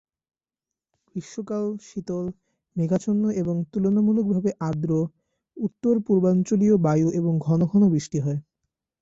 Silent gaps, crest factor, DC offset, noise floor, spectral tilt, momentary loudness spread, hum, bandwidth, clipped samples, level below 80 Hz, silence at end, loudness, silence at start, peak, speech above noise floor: none; 14 dB; under 0.1%; -89 dBFS; -8.5 dB/octave; 13 LU; none; 7.8 kHz; under 0.1%; -60 dBFS; 0.6 s; -23 LUFS; 1.15 s; -10 dBFS; 67 dB